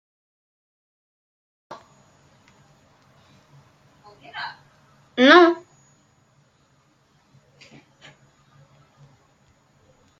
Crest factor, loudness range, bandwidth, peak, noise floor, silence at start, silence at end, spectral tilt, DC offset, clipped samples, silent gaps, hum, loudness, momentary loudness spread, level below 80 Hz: 26 dB; 21 LU; 7.2 kHz; -2 dBFS; -62 dBFS; 1.7 s; 4.65 s; -4 dB/octave; under 0.1%; under 0.1%; none; none; -17 LUFS; 32 LU; -74 dBFS